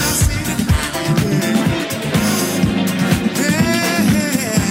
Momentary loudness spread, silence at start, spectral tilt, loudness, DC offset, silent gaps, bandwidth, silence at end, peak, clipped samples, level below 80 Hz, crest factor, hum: 3 LU; 0 s; -4.5 dB/octave; -16 LUFS; under 0.1%; none; 16.5 kHz; 0 s; -2 dBFS; under 0.1%; -30 dBFS; 14 dB; none